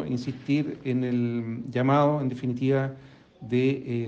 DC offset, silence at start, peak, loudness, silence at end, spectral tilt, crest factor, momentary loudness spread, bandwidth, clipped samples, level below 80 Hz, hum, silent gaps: under 0.1%; 0 s; -12 dBFS; -26 LUFS; 0 s; -8.5 dB/octave; 16 dB; 9 LU; 7.4 kHz; under 0.1%; -64 dBFS; none; none